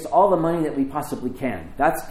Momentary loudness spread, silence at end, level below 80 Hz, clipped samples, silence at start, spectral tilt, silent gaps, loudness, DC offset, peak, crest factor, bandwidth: 11 LU; 0 s; -44 dBFS; under 0.1%; 0 s; -6.5 dB/octave; none; -23 LUFS; under 0.1%; -6 dBFS; 16 dB; 16.5 kHz